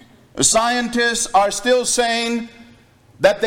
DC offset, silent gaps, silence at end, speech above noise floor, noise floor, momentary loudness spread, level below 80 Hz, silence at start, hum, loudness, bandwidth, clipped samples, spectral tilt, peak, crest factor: under 0.1%; none; 0 s; 32 dB; -49 dBFS; 10 LU; -48 dBFS; 0.35 s; none; -17 LUFS; 17 kHz; under 0.1%; -1.5 dB/octave; -2 dBFS; 16 dB